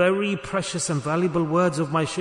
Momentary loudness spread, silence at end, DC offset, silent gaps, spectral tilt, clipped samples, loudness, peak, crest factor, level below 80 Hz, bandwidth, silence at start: 4 LU; 0 s; under 0.1%; none; -5 dB/octave; under 0.1%; -24 LUFS; -8 dBFS; 14 dB; -56 dBFS; 11 kHz; 0 s